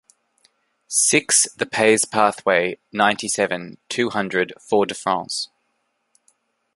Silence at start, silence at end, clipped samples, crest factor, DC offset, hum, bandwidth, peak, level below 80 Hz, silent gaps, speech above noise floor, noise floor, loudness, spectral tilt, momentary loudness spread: 0.9 s; 1.3 s; under 0.1%; 22 dB; under 0.1%; none; 12 kHz; 0 dBFS; -66 dBFS; none; 51 dB; -71 dBFS; -19 LUFS; -2 dB/octave; 10 LU